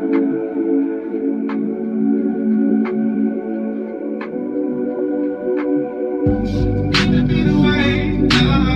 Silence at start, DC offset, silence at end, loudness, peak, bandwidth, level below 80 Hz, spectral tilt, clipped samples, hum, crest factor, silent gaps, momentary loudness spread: 0 s; under 0.1%; 0 s; -18 LUFS; -2 dBFS; 9.4 kHz; -32 dBFS; -7 dB/octave; under 0.1%; none; 16 dB; none; 9 LU